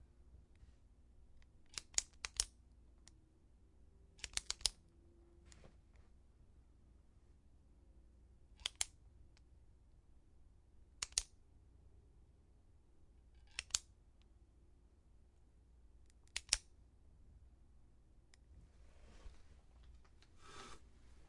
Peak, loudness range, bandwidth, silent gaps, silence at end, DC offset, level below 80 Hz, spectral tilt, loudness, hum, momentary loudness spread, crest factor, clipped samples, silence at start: -10 dBFS; 21 LU; 11.5 kHz; none; 0 s; under 0.1%; -64 dBFS; 0.5 dB/octave; -43 LUFS; none; 27 LU; 42 dB; under 0.1%; 0 s